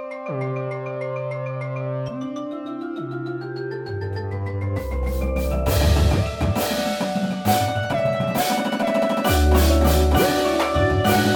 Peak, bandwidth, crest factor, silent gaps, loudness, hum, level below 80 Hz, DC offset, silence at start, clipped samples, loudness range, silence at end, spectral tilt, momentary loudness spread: -4 dBFS; 17.5 kHz; 16 dB; none; -22 LUFS; none; -28 dBFS; under 0.1%; 0 s; under 0.1%; 9 LU; 0 s; -5.5 dB/octave; 12 LU